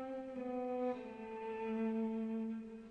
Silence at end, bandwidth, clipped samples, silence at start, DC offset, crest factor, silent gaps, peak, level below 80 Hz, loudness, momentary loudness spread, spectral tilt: 0 s; 6 kHz; under 0.1%; 0 s; under 0.1%; 12 dB; none; -28 dBFS; -74 dBFS; -42 LUFS; 8 LU; -8 dB/octave